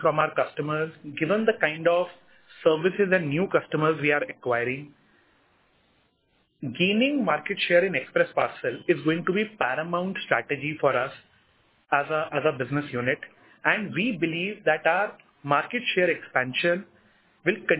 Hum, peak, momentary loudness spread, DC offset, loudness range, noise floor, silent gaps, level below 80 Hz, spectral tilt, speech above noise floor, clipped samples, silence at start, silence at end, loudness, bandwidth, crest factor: none; -6 dBFS; 7 LU; under 0.1%; 3 LU; -69 dBFS; none; -70 dBFS; -9.5 dB/octave; 43 dB; under 0.1%; 0 s; 0 s; -25 LUFS; 4 kHz; 20 dB